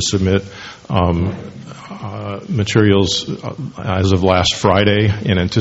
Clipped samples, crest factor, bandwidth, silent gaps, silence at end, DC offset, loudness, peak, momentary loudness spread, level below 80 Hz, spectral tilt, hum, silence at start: under 0.1%; 16 dB; 8 kHz; none; 0 s; under 0.1%; -16 LUFS; 0 dBFS; 17 LU; -38 dBFS; -5.5 dB/octave; none; 0 s